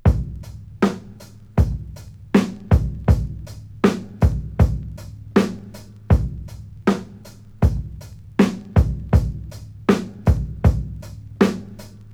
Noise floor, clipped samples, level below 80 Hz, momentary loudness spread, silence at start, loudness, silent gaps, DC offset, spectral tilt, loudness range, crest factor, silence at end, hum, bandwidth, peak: -41 dBFS; under 0.1%; -26 dBFS; 18 LU; 0.05 s; -21 LUFS; none; under 0.1%; -8 dB/octave; 2 LU; 20 dB; 0 s; none; 15 kHz; -2 dBFS